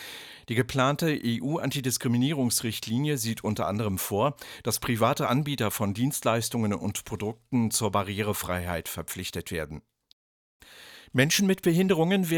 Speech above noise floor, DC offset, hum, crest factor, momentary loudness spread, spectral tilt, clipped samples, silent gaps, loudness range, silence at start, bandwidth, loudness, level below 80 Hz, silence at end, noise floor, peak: 23 dB; under 0.1%; none; 20 dB; 11 LU; -4.5 dB/octave; under 0.1%; 10.13-10.60 s; 3 LU; 0 s; 19.5 kHz; -27 LUFS; -56 dBFS; 0 s; -50 dBFS; -8 dBFS